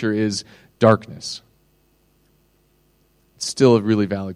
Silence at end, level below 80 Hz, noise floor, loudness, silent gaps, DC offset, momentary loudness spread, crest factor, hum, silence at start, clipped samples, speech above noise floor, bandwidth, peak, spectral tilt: 0 s; -60 dBFS; -61 dBFS; -19 LUFS; none; under 0.1%; 15 LU; 20 dB; none; 0 s; under 0.1%; 42 dB; 12.5 kHz; 0 dBFS; -5.5 dB/octave